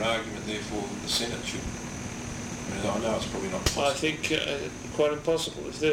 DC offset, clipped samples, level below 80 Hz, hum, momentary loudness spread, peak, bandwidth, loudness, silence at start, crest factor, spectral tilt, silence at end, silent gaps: under 0.1%; under 0.1%; -46 dBFS; none; 10 LU; -10 dBFS; 16 kHz; -30 LUFS; 0 s; 20 dB; -3.5 dB/octave; 0 s; none